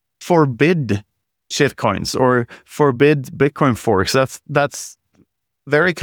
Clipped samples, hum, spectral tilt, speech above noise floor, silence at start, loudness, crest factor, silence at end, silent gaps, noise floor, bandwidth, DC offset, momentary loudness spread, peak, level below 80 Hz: under 0.1%; none; -5.5 dB/octave; 43 dB; 0.2 s; -17 LUFS; 16 dB; 0 s; none; -59 dBFS; 19.5 kHz; under 0.1%; 9 LU; -2 dBFS; -50 dBFS